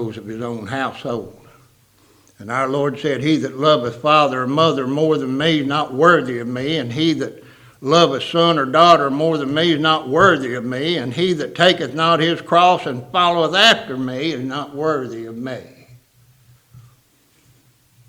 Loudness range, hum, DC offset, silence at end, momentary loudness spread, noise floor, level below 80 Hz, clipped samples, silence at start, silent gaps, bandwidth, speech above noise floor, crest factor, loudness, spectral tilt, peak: 9 LU; none; under 0.1%; 1.3 s; 13 LU; -57 dBFS; -58 dBFS; under 0.1%; 0 s; none; 16 kHz; 40 dB; 18 dB; -17 LUFS; -5 dB/octave; 0 dBFS